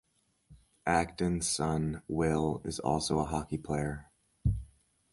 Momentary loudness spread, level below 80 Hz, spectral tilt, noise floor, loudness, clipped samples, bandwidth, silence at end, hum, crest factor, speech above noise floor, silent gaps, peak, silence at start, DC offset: 6 LU; -46 dBFS; -5 dB/octave; -63 dBFS; -32 LUFS; under 0.1%; 11.5 kHz; 0.45 s; none; 20 dB; 32 dB; none; -12 dBFS; 0.5 s; under 0.1%